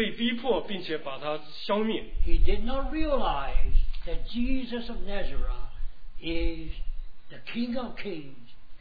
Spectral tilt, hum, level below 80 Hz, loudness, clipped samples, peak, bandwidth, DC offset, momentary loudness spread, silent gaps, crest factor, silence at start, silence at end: -8 dB/octave; none; -30 dBFS; -32 LUFS; under 0.1%; -8 dBFS; 4.9 kHz; 2%; 14 LU; none; 16 dB; 0 s; 0 s